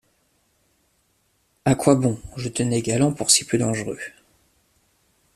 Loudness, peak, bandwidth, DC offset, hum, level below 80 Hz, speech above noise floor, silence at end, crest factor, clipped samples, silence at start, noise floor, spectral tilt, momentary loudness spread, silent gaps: -21 LUFS; -2 dBFS; 14.5 kHz; under 0.1%; none; -54 dBFS; 46 dB; 1.25 s; 22 dB; under 0.1%; 1.65 s; -67 dBFS; -4 dB/octave; 14 LU; none